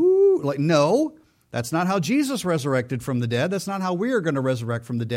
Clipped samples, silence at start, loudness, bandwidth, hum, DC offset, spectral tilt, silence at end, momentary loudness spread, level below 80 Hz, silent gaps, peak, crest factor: under 0.1%; 0 s; -23 LUFS; 16.5 kHz; none; under 0.1%; -6 dB/octave; 0 s; 9 LU; -62 dBFS; none; -8 dBFS; 14 dB